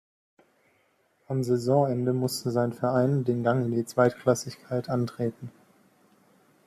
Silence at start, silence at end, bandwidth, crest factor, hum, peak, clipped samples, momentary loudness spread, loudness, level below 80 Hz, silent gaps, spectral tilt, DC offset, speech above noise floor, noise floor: 1.3 s; 1.15 s; 14 kHz; 20 dB; none; -8 dBFS; under 0.1%; 9 LU; -27 LUFS; -66 dBFS; none; -6.5 dB/octave; under 0.1%; 42 dB; -68 dBFS